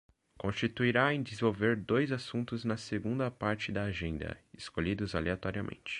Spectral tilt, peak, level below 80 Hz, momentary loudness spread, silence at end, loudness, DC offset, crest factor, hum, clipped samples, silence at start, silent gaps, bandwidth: -6.5 dB/octave; -12 dBFS; -52 dBFS; 10 LU; 0 s; -33 LUFS; under 0.1%; 22 dB; none; under 0.1%; 0.4 s; none; 10.5 kHz